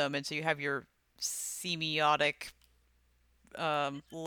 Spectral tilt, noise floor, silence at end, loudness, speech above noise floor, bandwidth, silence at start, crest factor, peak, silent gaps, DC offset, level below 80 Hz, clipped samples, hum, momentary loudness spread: -2.5 dB/octave; -70 dBFS; 0 s; -33 LUFS; 36 dB; over 20 kHz; 0 s; 22 dB; -14 dBFS; none; under 0.1%; -72 dBFS; under 0.1%; none; 11 LU